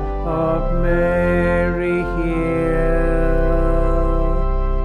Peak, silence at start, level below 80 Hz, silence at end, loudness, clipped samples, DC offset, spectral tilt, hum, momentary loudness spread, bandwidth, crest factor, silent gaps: -6 dBFS; 0 s; -20 dBFS; 0 s; -19 LUFS; under 0.1%; under 0.1%; -9 dB/octave; none; 4 LU; 4.4 kHz; 12 dB; none